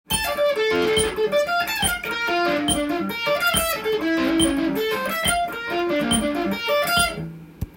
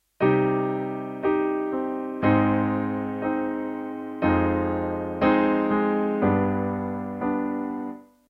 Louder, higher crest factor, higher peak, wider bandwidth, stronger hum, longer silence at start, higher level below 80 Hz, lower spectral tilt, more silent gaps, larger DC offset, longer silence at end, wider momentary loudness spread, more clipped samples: first, -21 LUFS vs -25 LUFS; about the same, 16 dB vs 16 dB; about the same, -6 dBFS vs -8 dBFS; first, 17 kHz vs 5.2 kHz; neither; about the same, 0.1 s vs 0.2 s; first, -42 dBFS vs -50 dBFS; second, -3 dB/octave vs -10 dB/octave; neither; neither; second, 0 s vs 0.25 s; second, 5 LU vs 9 LU; neither